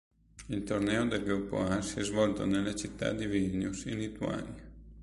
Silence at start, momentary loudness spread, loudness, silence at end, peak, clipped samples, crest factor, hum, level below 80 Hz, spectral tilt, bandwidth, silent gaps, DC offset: 0.35 s; 10 LU; -33 LUFS; 0 s; -16 dBFS; under 0.1%; 18 dB; none; -52 dBFS; -5.5 dB/octave; 11.5 kHz; none; under 0.1%